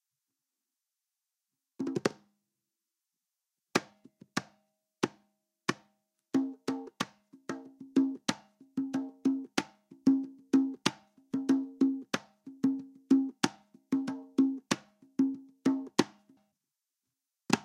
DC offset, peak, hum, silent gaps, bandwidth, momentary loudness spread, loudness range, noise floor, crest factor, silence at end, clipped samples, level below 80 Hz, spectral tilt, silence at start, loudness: under 0.1%; -8 dBFS; none; none; 13 kHz; 11 LU; 8 LU; -89 dBFS; 26 dB; 0 s; under 0.1%; -82 dBFS; -4.5 dB/octave; 1.8 s; -33 LUFS